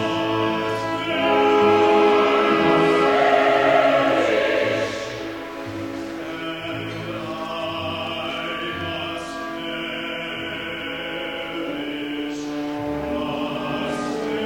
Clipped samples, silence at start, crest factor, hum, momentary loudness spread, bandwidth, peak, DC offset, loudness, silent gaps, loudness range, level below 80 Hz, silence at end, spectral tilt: under 0.1%; 0 s; 16 dB; none; 13 LU; 17.5 kHz; -4 dBFS; under 0.1%; -22 LUFS; none; 11 LU; -52 dBFS; 0 s; -5 dB/octave